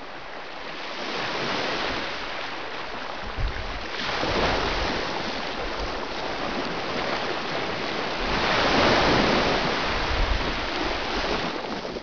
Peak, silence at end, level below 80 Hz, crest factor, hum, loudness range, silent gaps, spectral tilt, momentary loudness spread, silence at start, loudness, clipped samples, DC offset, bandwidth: -8 dBFS; 0 s; -36 dBFS; 18 dB; none; 7 LU; none; -4 dB/octave; 12 LU; 0 s; -26 LUFS; under 0.1%; 1%; 5.4 kHz